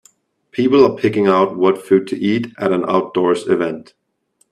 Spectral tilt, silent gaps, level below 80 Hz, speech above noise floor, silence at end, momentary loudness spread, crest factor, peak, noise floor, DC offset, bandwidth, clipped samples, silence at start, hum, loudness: -7 dB/octave; none; -58 dBFS; 47 dB; 0.7 s; 7 LU; 16 dB; 0 dBFS; -62 dBFS; under 0.1%; 11.5 kHz; under 0.1%; 0.55 s; none; -16 LUFS